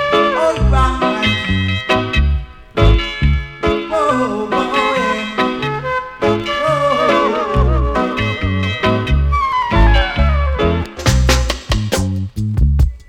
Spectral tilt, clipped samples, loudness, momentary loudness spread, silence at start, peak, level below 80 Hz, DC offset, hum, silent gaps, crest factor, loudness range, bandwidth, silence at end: -5.5 dB/octave; under 0.1%; -16 LUFS; 5 LU; 0 s; -2 dBFS; -18 dBFS; under 0.1%; none; none; 12 dB; 1 LU; 15 kHz; 0.05 s